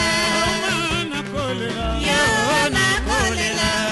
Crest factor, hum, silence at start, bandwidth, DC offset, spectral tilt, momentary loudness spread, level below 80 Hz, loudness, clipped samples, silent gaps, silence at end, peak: 14 dB; none; 0 s; 12 kHz; under 0.1%; -3 dB/octave; 7 LU; -34 dBFS; -19 LUFS; under 0.1%; none; 0 s; -6 dBFS